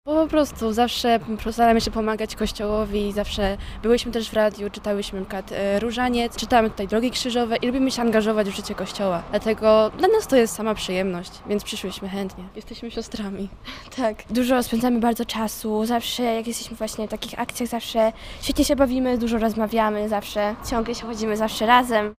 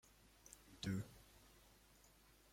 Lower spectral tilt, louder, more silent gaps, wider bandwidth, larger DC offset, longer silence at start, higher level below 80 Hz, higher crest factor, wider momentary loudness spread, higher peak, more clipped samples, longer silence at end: about the same, -4.5 dB/octave vs -5 dB/octave; first, -23 LUFS vs -50 LUFS; neither; about the same, 16 kHz vs 16.5 kHz; neither; second, 0.05 s vs 0.25 s; first, -40 dBFS vs -72 dBFS; about the same, 20 dB vs 22 dB; second, 11 LU vs 22 LU; first, -2 dBFS vs -32 dBFS; neither; second, 0.05 s vs 0.45 s